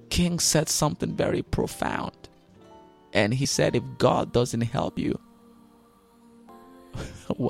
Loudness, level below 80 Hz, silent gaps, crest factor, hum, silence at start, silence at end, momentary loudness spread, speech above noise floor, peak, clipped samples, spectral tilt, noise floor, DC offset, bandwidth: -25 LUFS; -44 dBFS; none; 22 dB; none; 0.1 s; 0 s; 14 LU; 32 dB; -6 dBFS; under 0.1%; -4.5 dB/octave; -57 dBFS; under 0.1%; 16 kHz